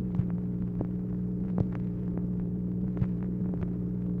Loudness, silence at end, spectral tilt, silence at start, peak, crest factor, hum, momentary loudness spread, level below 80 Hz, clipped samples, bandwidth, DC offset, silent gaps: -32 LUFS; 0 s; -12.5 dB/octave; 0 s; -14 dBFS; 16 dB; 60 Hz at -40 dBFS; 2 LU; -44 dBFS; under 0.1%; 2.9 kHz; under 0.1%; none